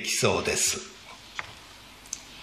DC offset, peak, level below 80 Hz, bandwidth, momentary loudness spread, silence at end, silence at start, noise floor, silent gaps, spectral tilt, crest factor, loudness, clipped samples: under 0.1%; -8 dBFS; -54 dBFS; 14.5 kHz; 22 LU; 0 s; 0 s; -48 dBFS; none; -2 dB/octave; 22 dB; -27 LUFS; under 0.1%